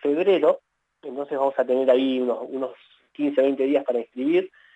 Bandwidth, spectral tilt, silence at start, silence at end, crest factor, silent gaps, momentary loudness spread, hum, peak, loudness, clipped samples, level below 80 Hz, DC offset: 8 kHz; -7 dB/octave; 0.05 s; 0.3 s; 16 dB; none; 12 LU; none; -6 dBFS; -23 LUFS; under 0.1%; -86 dBFS; under 0.1%